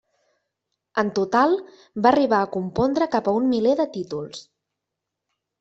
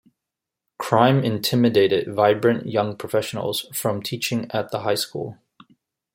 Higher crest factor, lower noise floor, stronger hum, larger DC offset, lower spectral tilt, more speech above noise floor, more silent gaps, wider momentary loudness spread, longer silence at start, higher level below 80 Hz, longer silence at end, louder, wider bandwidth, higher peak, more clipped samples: about the same, 20 dB vs 20 dB; about the same, -83 dBFS vs -85 dBFS; neither; neither; about the same, -6 dB/octave vs -5.5 dB/octave; about the same, 62 dB vs 64 dB; neither; first, 12 LU vs 9 LU; first, 0.95 s vs 0.8 s; about the same, -58 dBFS vs -62 dBFS; first, 1.2 s vs 0.8 s; about the same, -22 LUFS vs -21 LUFS; second, 8 kHz vs 16.5 kHz; about the same, -4 dBFS vs -2 dBFS; neither